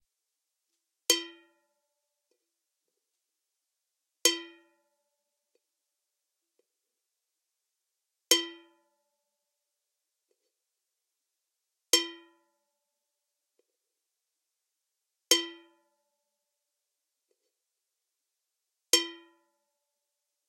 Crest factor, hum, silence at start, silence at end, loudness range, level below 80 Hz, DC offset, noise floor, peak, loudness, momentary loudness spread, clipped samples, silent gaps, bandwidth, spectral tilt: 36 dB; none; 1.1 s; 1.3 s; 2 LU; under -90 dBFS; under 0.1%; -86 dBFS; -2 dBFS; -27 LUFS; 14 LU; under 0.1%; none; 16 kHz; 3 dB/octave